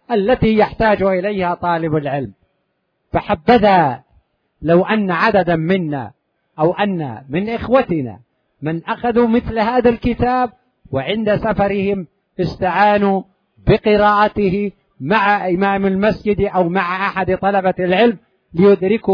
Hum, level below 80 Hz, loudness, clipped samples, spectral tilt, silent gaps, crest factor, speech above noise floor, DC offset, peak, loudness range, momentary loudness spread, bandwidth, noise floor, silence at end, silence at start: none; -40 dBFS; -16 LUFS; under 0.1%; -9 dB/octave; none; 16 dB; 53 dB; under 0.1%; -2 dBFS; 3 LU; 11 LU; 5.4 kHz; -68 dBFS; 0 s; 0.1 s